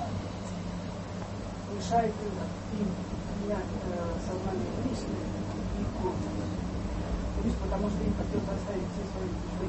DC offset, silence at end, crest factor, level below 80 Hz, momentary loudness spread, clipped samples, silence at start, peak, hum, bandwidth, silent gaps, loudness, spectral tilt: under 0.1%; 0 s; 18 dB; -40 dBFS; 7 LU; under 0.1%; 0 s; -14 dBFS; none; 8.4 kHz; none; -34 LUFS; -7 dB/octave